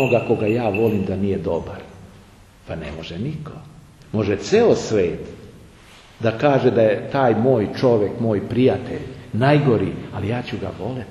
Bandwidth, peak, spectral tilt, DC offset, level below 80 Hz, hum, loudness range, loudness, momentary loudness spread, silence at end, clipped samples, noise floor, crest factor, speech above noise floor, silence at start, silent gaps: 13 kHz; -2 dBFS; -7 dB/octave; under 0.1%; -48 dBFS; none; 7 LU; -20 LUFS; 15 LU; 0 s; under 0.1%; -47 dBFS; 18 dB; 27 dB; 0 s; none